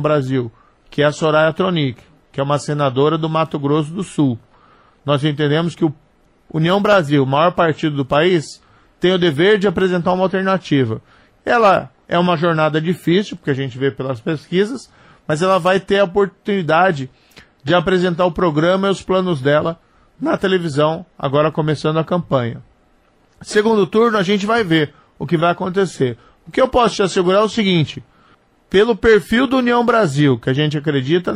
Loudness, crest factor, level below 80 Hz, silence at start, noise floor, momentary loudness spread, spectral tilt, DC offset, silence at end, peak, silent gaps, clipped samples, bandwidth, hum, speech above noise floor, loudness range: -16 LUFS; 14 dB; -48 dBFS; 0 s; -55 dBFS; 9 LU; -6.5 dB/octave; under 0.1%; 0 s; -2 dBFS; none; under 0.1%; 13 kHz; none; 39 dB; 3 LU